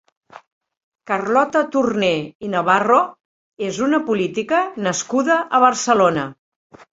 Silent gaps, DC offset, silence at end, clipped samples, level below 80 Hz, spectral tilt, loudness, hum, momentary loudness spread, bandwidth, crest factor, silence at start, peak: 0.47-0.61 s, 0.77-0.91 s, 2.35-2.40 s, 3.25-3.52 s; under 0.1%; 0.6 s; under 0.1%; -62 dBFS; -4 dB/octave; -18 LUFS; none; 10 LU; 8 kHz; 18 dB; 0.35 s; -2 dBFS